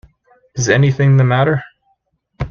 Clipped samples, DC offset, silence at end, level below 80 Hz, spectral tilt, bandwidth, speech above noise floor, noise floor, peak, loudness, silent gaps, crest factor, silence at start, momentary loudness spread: under 0.1%; under 0.1%; 0 s; -42 dBFS; -6 dB/octave; 7.2 kHz; 52 dB; -64 dBFS; 0 dBFS; -14 LUFS; none; 16 dB; 0.55 s; 14 LU